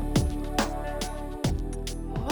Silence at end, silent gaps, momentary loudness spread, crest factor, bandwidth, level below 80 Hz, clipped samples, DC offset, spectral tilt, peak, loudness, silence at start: 0 s; none; 7 LU; 16 dB; over 20 kHz; -32 dBFS; under 0.1%; under 0.1%; -5 dB/octave; -12 dBFS; -31 LUFS; 0 s